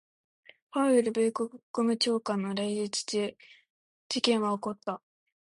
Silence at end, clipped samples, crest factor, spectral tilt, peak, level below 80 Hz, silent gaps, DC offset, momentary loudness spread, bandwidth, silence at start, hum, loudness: 0.55 s; under 0.1%; 18 dB; -4 dB/octave; -12 dBFS; -76 dBFS; 1.63-1.74 s, 3.70-4.10 s; under 0.1%; 11 LU; 11.5 kHz; 0.75 s; none; -29 LUFS